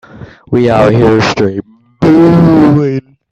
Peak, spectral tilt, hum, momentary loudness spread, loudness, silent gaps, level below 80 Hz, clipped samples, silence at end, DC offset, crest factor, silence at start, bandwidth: 0 dBFS; -7.5 dB/octave; none; 10 LU; -8 LUFS; none; -38 dBFS; under 0.1%; 0.3 s; under 0.1%; 8 dB; 0.15 s; 8.2 kHz